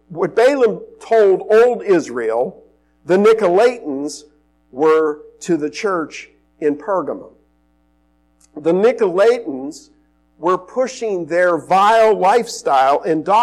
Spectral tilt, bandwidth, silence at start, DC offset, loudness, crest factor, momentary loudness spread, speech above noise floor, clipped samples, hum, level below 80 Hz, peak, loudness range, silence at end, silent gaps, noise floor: -5 dB/octave; 12.5 kHz; 0.1 s; under 0.1%; -16 LUFS; 12 dB; 15 LU; 44 dB; under 0.1%; none; -60 dBFS; -6 dBFS; 6 LU; 0 s; none; -59 dBFS